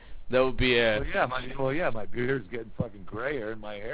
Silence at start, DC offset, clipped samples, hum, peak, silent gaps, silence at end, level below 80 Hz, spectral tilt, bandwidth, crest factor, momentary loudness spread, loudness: 0 s; 0.6%; under 0.1%; none; -10 dBFS; none; 0 s; -42 dBFS; -9 dB/octave; 4 kHz; 18 dB; 13 LU; -28 LUFS